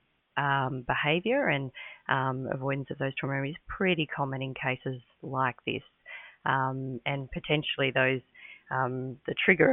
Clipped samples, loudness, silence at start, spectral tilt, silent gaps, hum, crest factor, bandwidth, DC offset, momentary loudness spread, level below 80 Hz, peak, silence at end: under 0.1%; -30 LUFS; 0.35 s; -10 dB/octave; none; none; 22 dB; 3.9 kHz; under 0.1%; 12 LU; -58 dBFS; -8 dBFS; 0 s